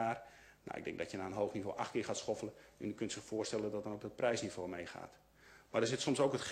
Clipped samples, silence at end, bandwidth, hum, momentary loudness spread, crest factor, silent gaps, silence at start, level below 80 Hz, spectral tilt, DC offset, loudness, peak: under 0.1%; 0 s; 15 kHz; none; 14 LU; 20 dB; none; 0 s; -72 dBFS; -4.5 dB/octave; under 0.1%; -40 LUFS; -20 dBFS